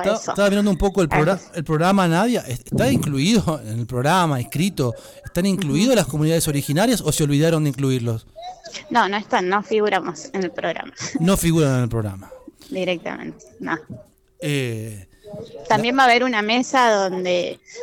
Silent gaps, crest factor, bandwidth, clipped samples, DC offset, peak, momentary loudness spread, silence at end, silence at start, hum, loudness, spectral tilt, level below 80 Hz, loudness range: none; 18 dB; 19 kHz; under 0.1%; under 0.1%; -2 dBFS; 14 LU; 0 s; 0 s; none; -20 LUFS; -5 dB/octave; -42 dBFS; 6 LU